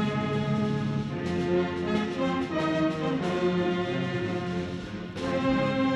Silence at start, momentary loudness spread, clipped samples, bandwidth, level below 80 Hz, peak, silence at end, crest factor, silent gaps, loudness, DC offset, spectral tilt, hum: 0 s; 5 LU; under 0.1%; 11 kHz; -52 dBFS; -14 dBFS; 0 s; 14 dB; none; -28 LUFS; under 0.1%; -7 dB/octave; none